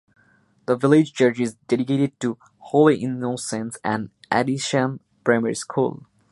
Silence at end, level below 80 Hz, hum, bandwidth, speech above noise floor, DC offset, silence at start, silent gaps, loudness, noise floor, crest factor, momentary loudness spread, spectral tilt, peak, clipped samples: 0.35 s; -66 dBFS; none; 11.5 kHz; 39 dB; under 0.1%; 0.7 s; none; -22 LUFS; -60 dBFS; 20 dB; 11 LU; -5.5 dB/octave; -2 dBFS; under 0.1%